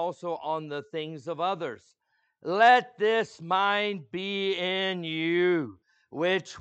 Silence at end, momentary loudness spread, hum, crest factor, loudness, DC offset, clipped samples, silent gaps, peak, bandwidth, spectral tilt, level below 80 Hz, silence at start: 0 s; 14 LU; none; 20 dB; -27 LUFS; under 0.1%; under 0.1%; none; -8 dBFS; 8.4 kHz; -5 dB/octave; -80 dBFS; 0 s